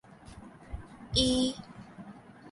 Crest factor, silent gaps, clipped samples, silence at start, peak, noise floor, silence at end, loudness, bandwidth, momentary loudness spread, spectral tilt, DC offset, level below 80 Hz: 22 dB; none; under 0.1%; 0.25 s; -12 dBFS; -50 dBFS; 0 s; -28 LUFS; 11.5 kHz; 24 LU; -4.5 dB/octave; under 0.1%; -48 dBFS